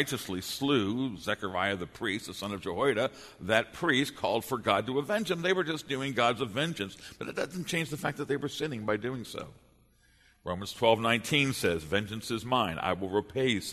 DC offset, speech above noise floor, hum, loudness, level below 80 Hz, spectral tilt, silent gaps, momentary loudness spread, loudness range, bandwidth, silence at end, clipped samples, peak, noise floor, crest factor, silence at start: under 0.1%; 33 dB; none; -30 LUFS; -60 dBFS; -4.5 dB/octave; none; 10 LU; 5 LU; 13.5 kHz; 0 s; under 0.1%; -8 dBFS; -64 dBFS; 22 dB; 0 s